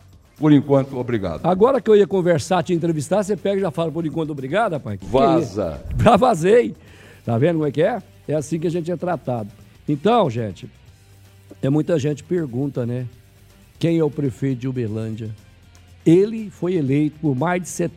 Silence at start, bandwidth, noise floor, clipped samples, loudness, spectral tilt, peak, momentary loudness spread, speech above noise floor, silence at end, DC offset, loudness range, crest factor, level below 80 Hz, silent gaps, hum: 0.4 s; 15 kHz; -49 dBFS; under 0.1%; -20 LUFS; -7 dB/octave; 0 dBFS; 12 LU; 30 dB; 0.05 s; under 0.1%; 6 LU; 20 dB; -44 dBFS; none; none